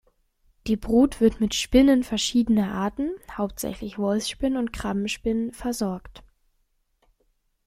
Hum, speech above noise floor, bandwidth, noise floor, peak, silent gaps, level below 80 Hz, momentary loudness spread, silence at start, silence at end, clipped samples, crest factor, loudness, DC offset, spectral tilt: none; 46 dB; 15.5 kHz; -70 dBFS; -6 dBFS; none; -44 dBFS; 12 LU; 0.65 s; 1.45 s; under 0.1%; 18 dB; -24 LUFS; under 0.1%; -4.5 dB/octave